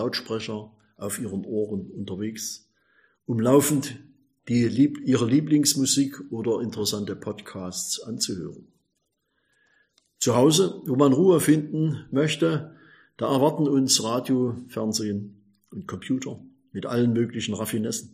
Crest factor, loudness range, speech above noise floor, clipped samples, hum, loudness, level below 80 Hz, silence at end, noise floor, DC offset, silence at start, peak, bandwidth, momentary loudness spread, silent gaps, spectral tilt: 20 dB; 8 LU; 52 dB; under 0.1%; none; -24 LUFS; -66 dBFS; 0.05 s; -76 dBFS; under 0.1%; 0 s; -4 dBFS; 15.5 kHz; 16 LU; none; -4.5 dB/octave